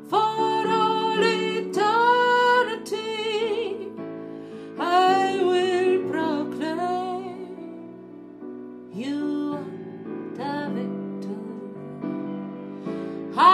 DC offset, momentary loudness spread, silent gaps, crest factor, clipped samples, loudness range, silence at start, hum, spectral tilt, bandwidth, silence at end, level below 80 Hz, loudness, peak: under 0.1%; 19 LU; none; 20 dB; under 0.1%; 11 LU; 0 s; none; -5 dB/octave; 13.5 kHz; 0 s; -76 dBFS; -24 LUFS; -4 dBFS